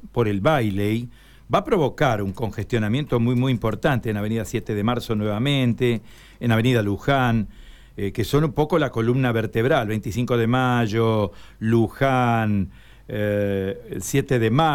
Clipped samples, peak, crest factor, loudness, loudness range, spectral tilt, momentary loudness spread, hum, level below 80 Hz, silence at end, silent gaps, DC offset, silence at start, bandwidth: under 0.1%; -8 dBFS; 14 dB; -22 LUFS; 2 LU; -6.5 dB/octave; 8 LU; none; -44 dBFS; 0 s; none; under 0.1%; 0 s; 17 kHz